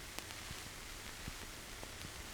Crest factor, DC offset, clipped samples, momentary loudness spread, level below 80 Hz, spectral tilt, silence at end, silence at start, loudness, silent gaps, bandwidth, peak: 32 dB; under 0.1%; under 0.1%; 2 LU; -56 dBFS; -2.5 dB/octave; 0 s; 0 s; -47 LUFS; none; over 20 kHz; -16 dBFS